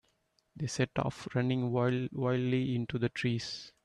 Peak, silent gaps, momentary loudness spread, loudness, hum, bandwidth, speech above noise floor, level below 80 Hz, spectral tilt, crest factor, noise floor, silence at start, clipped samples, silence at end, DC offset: -16 dBFS; none; 6 LU; -33 LUFS; none; 11 kHz; 43 dB; -64 dBFS; -6.5 dB/octave; 16 dB; -75 dBFS; 0.55 s; under 0.1%; 0.15 s; under 0.1%